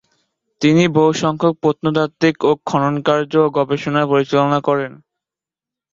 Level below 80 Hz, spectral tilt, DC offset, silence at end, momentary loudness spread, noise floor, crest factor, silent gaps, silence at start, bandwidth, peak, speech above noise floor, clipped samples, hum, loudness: -56 dBFS; -6.5 dB/octave; under 0.1%; 1 s; 5 LU; -88 dBFS; 16 dB; none; 0.6 s; 7.6 kHz; -2 dBFS; 72 dB; under 0.1%; none; -16 LUFS